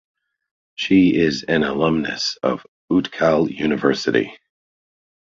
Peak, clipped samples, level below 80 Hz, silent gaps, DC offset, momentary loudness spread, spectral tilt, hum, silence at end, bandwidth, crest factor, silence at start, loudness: -2 dBFS; under 0.1%; -50 dBFS; 2.68-2.88 s; under 0.1%; 9 LU; -5.5 dB/octave; none; 0.9 s; 7.6 kHz; 18 dB; 0.8 s; -19 LUFS